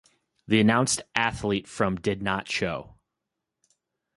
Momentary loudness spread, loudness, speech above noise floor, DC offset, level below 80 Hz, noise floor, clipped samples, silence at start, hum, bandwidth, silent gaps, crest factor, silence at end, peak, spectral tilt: 8 LU; -25 LUFS; 59 dB; under 0.1%; -52 dBFS; -84 dBFS; under 0.1%; 0.5 s; none; 11.5 kHz; none; 22 dB; 1.3 s; -6 dBFS; -4 dB/octave